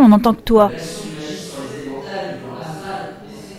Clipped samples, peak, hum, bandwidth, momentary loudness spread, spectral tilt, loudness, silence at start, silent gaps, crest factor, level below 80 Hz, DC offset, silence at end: under 0.1%; -2 dBFS; none; 15.5 kHz; 16 LU; -6.5 dB/octave; -19 LUFS; 0 s; none; 16 dB; -40 dBFS; under 0.1%; 0 s